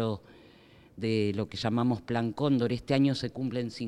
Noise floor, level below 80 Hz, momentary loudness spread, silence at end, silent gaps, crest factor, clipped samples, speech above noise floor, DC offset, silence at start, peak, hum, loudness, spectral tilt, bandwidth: -56 dBFS; -62 dBFS; 7 LU; 0 s; none; 18 dB; under 0.1%; 27 dB; under 0.1%; 0 s; -12 dBFS; none; -30 LUFS; -7 dB/octave; 11.5 kHz